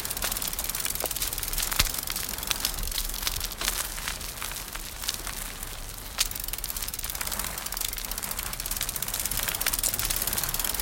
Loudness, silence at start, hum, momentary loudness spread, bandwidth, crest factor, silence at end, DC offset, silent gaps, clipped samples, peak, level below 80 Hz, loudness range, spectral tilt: -28 LUFS; 0 s; none; 8 LU; 17.5 kHz; 28 dB; 0 s; under 0.1%; none; under 0.1%; -2 dBFS; -40 dBFS; 4 LU; -0.5 dB/octave